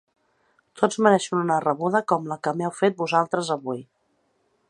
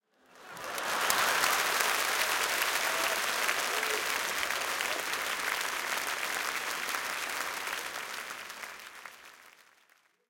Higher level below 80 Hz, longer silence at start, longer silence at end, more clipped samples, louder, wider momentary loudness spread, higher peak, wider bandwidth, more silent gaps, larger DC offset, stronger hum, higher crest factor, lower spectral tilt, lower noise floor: about the same, -74 dBFS vs -70 dBFS; first, 0.75 s vs 0.35 s; about the same, 0.85 s vs 0.8 s; neither; first, -23 LUFS vs -30 LUFS; second, 8 LU vs 15 LU; about the same, -2 dBFS vs -4 dBFS; second, 11 kHz vs 17 kHz; neither; neither; neither; second, 22 dB vs 28 dB; first, -5 dB/octave vs 1 dB/octave; about the same, -69 dBFS vs -67 dBFS